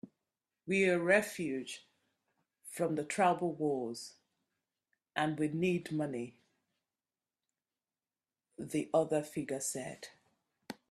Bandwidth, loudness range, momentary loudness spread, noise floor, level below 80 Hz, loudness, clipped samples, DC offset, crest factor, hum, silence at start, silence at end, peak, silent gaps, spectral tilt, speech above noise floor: 14.5 kHz; 6 LU; 19 LU; under -90 dBFS; -78 dBFS; -34 LUFS; under 0.1%; under 0.1%; 22 dB; none; 0.05 s; 0.2 s; -14 dBFS; none; -5 dB/octave; over 56 dB